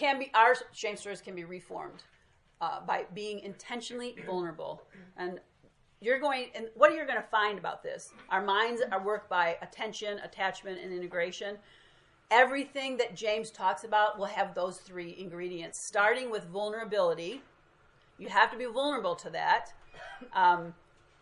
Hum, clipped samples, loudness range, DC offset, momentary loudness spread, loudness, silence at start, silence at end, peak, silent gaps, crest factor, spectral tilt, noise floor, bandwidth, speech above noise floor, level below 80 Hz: none; under 0.1%; 8 LU; under 0.1%; 17 LU; -31 LUFS; 0 s; 0.5 s; -6 dBFS; none; 26 dB; -3 dB/octave; -65 dBFS; 11.5 kHz; 33 dB; -72 dBFS